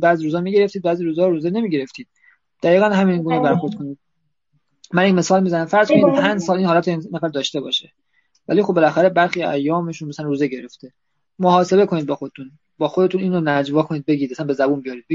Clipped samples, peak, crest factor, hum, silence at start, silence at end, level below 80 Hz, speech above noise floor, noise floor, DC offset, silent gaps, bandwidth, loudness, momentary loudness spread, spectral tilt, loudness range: under 0.1%; -2 dBFS; 18 dB; none; 0 s; 0 s; -64 dBFS; 56 dB; -73 dBFS; under 0.1%; none; 7.6 kHz; -18 LUFS; 10 LU; -6 dB/octave; 3 LU